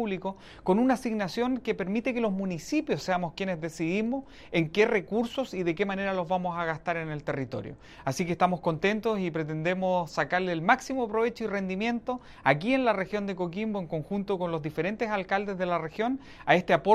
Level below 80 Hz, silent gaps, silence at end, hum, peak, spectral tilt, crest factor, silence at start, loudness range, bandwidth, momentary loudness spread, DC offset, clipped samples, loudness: -58 dBFS; none; 0 s; none; -6 dBFS; -6 dB/octave; 22 dB; 0 s; 3 LU; 14 kHz; 8 LU; under 0.1%; under 0.1%; -29 LUFS